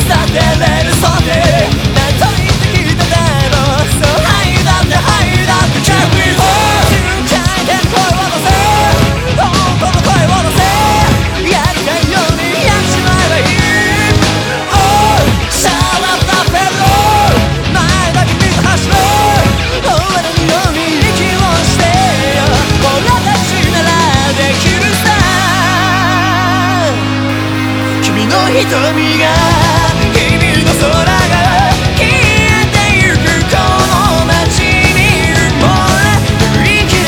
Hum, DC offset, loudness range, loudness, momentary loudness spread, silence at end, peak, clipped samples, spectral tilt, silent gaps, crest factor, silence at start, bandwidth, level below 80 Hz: none; under 0.1%; 2 LU; -9 LUFS; 3 LU; 0 s; 0 dBFS; 0.3%; -4.5 dB/octave; none; 10 dB; 0 s; over 20 kHz; -20 dBFS